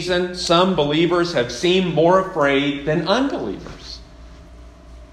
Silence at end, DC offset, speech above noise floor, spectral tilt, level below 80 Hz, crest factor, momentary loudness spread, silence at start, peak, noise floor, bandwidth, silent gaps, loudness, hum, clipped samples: 0.05 s; under 0.1%; 23 dB; -5 dB/octave; -44 dBFS; 18 dB; 17 LU; 0 s; -2 dBFS; -41 dBFS; 12 kHz; none; -18 LUFS; none; under 0.1%